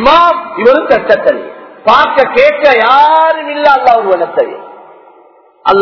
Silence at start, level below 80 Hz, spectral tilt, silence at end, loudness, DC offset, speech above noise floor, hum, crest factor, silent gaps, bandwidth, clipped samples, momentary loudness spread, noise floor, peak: 0 s; -44 dBFS; -5 dB/octave; 0 s; -8 LUFS; under 0.1%; 35 dB; none; 8 dB; none; 5.4 kHz; 4%; 10 LU; -43 dBFS; 0 dBFS